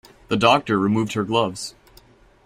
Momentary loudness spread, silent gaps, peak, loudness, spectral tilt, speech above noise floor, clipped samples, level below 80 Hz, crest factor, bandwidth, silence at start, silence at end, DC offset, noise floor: 12 LU; none; -2 dBFS; -20 LUFS; -5 dB/octave; 32 dB; under 0.1%; -54 dBFS; 20 dB; 15 kHz; 0.3 s; 0.75 s; under 0.1%; -52 dBFS